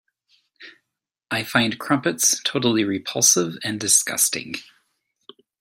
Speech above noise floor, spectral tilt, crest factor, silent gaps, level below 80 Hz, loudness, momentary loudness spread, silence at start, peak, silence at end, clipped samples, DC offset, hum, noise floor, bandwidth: 61 dB; -2 dB/octave; 22 dB; none; -66 dBFS; -19 LUFS; 11 LU; 0.6 s; -2 dBFS; 1 s; under 0.1%; under 0.1%; none; -82 dBFS; 16.5 kHz